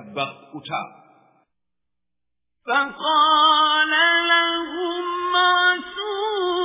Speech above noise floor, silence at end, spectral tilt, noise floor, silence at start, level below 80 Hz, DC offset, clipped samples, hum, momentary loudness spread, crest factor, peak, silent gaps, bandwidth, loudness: 66 dB; 0 s; -6 dB/octave; -85 dBFS; 0 s; -64 dBFS; under 0.1%; under 0.1%; none; 15 LU; 18 dB; -4 dBFS; none; 3.9 kHz; -19 LUFS